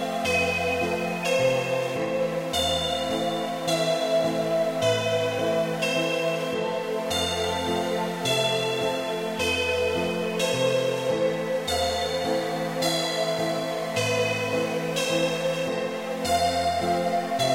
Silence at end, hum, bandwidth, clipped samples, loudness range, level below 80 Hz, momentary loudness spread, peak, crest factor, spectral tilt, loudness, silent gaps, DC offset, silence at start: 0 s; none; 16 kHz; under 0.1%; 1 LU; -54 dBFS; 4 LU; -12 dBFS; 14 dB; -4 dB/octave; -25 LUFS; none; under 0.1%; 0 s